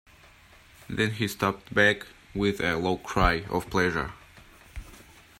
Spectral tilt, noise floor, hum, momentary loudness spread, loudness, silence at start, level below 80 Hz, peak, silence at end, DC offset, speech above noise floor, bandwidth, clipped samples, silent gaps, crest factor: -5 dB/octave; -54 dBFS; none; 17 LU; -27 LUFS; 0.9 s; -42 dBFS; -6 dBFS; 0.35 s; under 0.1%; 28 dB; 16 kHz; under 0.1%; none; 22 dB